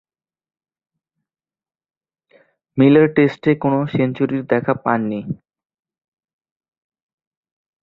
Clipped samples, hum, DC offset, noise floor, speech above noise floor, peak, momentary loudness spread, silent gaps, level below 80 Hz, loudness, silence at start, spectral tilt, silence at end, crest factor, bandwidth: under 0.1%; none; under 0.1%; -88 dBFS; 72 dB; -2 dBFS; 15 LU; none; -60 dBFS; -17 LUFS; 2.75 s; -9.5 dB/octave; 2.45 s; 20 dB; 5.2 kHz